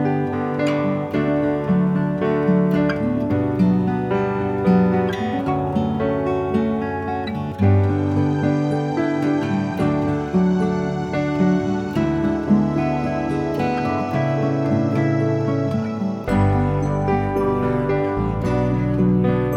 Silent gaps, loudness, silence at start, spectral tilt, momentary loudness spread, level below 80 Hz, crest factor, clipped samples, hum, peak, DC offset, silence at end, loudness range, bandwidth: none; -20 LUFS; 0 s; -9 dB/octave; 4 LU; -40 dBFS; 16 dB; under 0.1%; none; -4 dBFS; under 0.1%; 0 s; 1 LU; 8.4 kHz